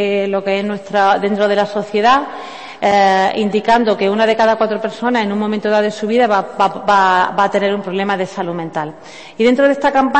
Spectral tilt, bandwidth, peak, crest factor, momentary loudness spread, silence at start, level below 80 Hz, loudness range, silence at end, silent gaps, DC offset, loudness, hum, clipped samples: -5.5 dB/octave; 8.6 kHz; -2 dBFS; 14 dB; 9 LU; 0 s; -54 dBFS; 1 LU; 0 s; none; 0.3%; -15 LUFS; none; under 0.1%